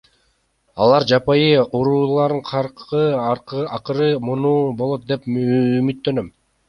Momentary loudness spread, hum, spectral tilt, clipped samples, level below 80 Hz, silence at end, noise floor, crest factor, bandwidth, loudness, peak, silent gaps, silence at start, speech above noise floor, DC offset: 9 LU; none; -7.5 dB/octave; under 0.1%; -54 dBFS; 0.4 s; -64 dBFS; 16 dB; 6.8 kHz; -18 LUFS; -2 dBFS; none; 0.75 s; 46 dB; under 0.1%